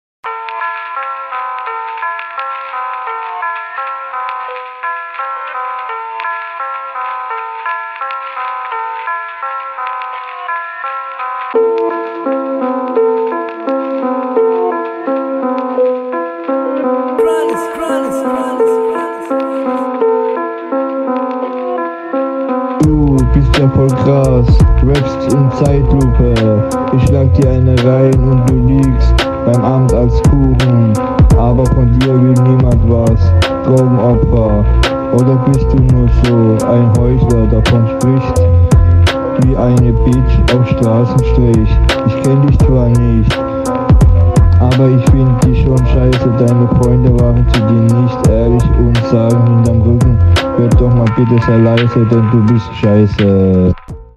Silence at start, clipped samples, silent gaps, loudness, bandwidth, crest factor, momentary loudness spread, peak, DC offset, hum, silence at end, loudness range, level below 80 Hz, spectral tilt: 0.25 s; under 0.1%; none; -12 LUFS; 12 kHz; 10 dB; 11 LU; 0 dBFS; under 0.1%; none; 0.15 s; 10 LU; -18 dBFS; -8 dB/octave